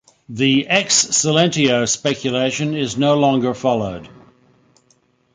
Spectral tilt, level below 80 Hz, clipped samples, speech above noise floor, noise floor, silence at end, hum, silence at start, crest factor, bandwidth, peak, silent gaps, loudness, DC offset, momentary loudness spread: -3.5 dB/octave; -54 dBFS; under 0.1%; 42 dB; -59 dBFS; 1.3 s; none; 0.3 s; 18 dB; 9.6 kHz; -2 dBFS; none; -17 LUFS; under 0.1%; 7 LU